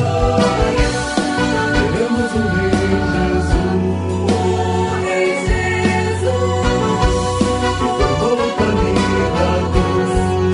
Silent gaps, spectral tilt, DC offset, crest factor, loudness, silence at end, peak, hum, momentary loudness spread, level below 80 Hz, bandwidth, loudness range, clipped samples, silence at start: none; -6 dB/octave; under 0.1%; 14 dB; -16 LUFS; 0 s; -2 dBFS; none; 2 LU; -26 dBFS; 11 kHz; 1 LU; under 0.1%; 0 s